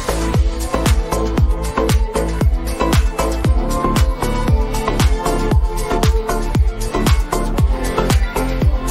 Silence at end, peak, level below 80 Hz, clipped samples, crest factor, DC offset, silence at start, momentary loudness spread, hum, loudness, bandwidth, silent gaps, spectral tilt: 0 s; -2 dBFS; -18 dBFS; under 0.1%; 14 dB; under 0.1%; 0 s; 3 LU; none; -18 LUFS; 16 kHz; none; -5.5 dB/octave